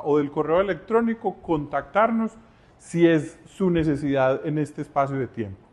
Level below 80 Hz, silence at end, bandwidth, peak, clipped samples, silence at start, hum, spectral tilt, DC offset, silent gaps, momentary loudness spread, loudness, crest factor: -52 dBFS; 0.15 s; 11 kHz; -6 dBFS; under 0.1%; 0 s; none; -7.5 dB/octave; under 0.1%; none; 9 LU; -24 LUFS; 16 dB